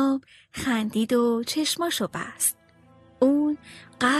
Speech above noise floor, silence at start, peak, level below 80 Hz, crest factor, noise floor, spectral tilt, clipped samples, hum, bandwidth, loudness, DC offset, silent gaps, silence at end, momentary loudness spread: 30 dB; 0 s; -8 dBFS; -60 dBFS; 16 dB; -55 dBFS; -3 dB/octave; under 0.1%; none; 13 kHz; -25 LUFS; under 0.1%; none; 0 s; 9 LU